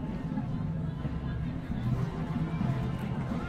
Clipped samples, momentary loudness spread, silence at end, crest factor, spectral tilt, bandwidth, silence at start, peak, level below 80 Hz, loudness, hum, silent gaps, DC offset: under 0.1%; 3 LU; 0 s; 14 dB; -9 dB/octave; 9.2 kHz; 0 s; -18 dBFS; -42 dBFS; -33 LUFS; none; none; under 0.1%